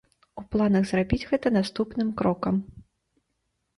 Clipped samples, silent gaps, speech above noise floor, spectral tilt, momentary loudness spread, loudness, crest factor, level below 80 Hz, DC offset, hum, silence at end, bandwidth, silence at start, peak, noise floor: under 0.1%; none; 52 dB; -7.5 dB/octave; 13 LU; -26 LUFS; 18 dB; -48 dBFS; under 0.1%; none; 0.95 s; 11.5 kHz; 0.35 s; -8 dBFS; -77 dBFS